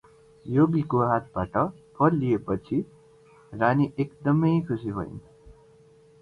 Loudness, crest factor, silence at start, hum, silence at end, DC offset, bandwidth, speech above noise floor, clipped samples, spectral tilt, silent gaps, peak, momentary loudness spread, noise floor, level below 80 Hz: -25 LUFS; 18 dB; 0.45 s; none; 0.7 s; under 0.1%; 5 kHz; 31 dB; under 0.1%; -10 dB/octave; none; -8 dBFS; 13 LU; -55 dBFS; -54 dBFS